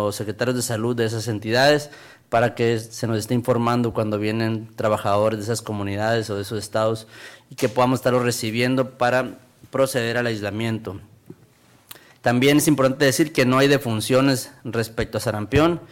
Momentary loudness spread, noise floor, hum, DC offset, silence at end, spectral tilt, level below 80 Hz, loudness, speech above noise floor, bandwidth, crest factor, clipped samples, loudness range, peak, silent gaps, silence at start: 10 LU; -54 dBFS; none; under 0.1%; 0.05 s; -5 dB/octave; -50 dBFS; -21 LUFS; 33 dB; 17 kHz; 14 dB; under 0.1%; 5 LU; -8 dBFS; none; 0 s